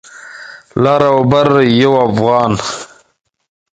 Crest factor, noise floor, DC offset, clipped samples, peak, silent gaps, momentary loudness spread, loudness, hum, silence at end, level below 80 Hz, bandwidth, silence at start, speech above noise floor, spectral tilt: 14 dB; -33 dBFS; under 0.1%; under 0.1%; 0 dBFS; none; 21 LU; -11 LUFS; none; 0.9 s; -46 dBFS; 9.4 kHz; 0.15 s; 23 dB; -6 dB/octave